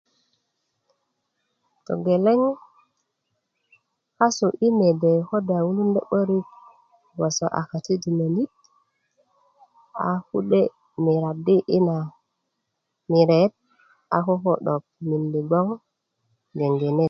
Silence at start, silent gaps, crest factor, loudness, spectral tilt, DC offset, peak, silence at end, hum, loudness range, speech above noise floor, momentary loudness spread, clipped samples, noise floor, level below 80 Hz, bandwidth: 1.9 s; none; 20 dB; -22 LUFS; -7 dB/octave; under 0.1%; -4 dBFS; 0 s; none; 5 LU; 57 dB; 10 LU; under 0.1%; -78 dBFS; -68 dBFS; 7.4 kHz